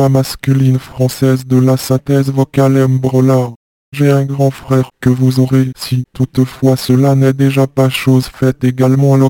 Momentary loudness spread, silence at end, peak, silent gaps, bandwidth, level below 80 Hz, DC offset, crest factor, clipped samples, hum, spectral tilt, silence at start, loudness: 5 LU; 0 s; 0 dBFS; 3.56-3.92 s; 17 kHz; -44 dBFS; under 0.1%; 10 dB; under 0.1%; none; -7.5 dB/octave; 0 s; -12 LUFS